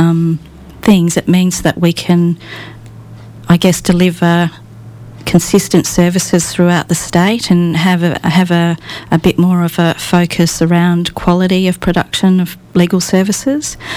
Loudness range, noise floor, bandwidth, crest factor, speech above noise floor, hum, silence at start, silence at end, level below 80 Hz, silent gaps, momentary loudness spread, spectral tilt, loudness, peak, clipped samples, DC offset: 2 LU; -32 dBFS; 15 kHz; 12 dB; 21 dB; none; 0 s; 0 s; -38 dBFS; none; 6 LU; -5.5 dB/octave; -12 LUFS; 0 dBFS; under 0.1%; under 0.1%